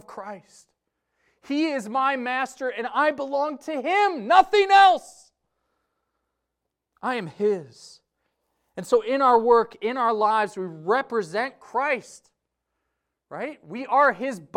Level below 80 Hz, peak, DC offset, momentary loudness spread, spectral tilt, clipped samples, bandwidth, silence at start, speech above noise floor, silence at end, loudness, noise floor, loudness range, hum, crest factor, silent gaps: -66 dBFS; -4 dBFS; under 0.1%; 17 LU; -4 dB/octave; under 0.1%; 11.5 kHz; 0.1 s; 60 dB; 0.15 s; -22 LUFS; -82 dBFS; 9 LU; none; 20 dB; none